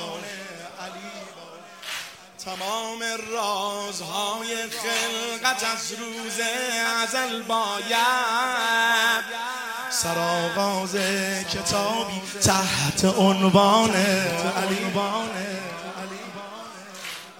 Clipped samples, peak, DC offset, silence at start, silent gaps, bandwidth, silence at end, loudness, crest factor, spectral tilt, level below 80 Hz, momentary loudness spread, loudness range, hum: under 0.1%; -4 dBFS; under 0.1%; 0 s; none; 16.5 kHz; 0 s; -23 LUFS; 20 dB; -3 dB/octave; -60 dBFS; 17 LU; 8 LU; none